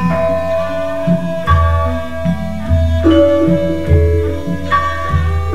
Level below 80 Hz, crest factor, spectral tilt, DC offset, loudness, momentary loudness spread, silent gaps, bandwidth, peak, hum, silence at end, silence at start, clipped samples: -22 dBFS; 14 dB; -8 dB/octave; 6%; -15 LUFS; 8 LU; none; 8.6 kHz; 0 dBFS; none; 0 s; 0 s; under 0.1%